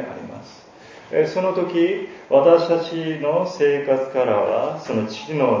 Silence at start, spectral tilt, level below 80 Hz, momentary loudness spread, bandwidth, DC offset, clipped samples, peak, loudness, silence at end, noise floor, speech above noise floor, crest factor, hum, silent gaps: 0 s; -6.5 dB/octave; -64 dBFS; 11 LU; 7.4 kHz; under 0.1%; under 0.1%; -2 dBFS; -20 LUFS; 0 s; -44 dBFS; 25 dB; 18 dB; none; none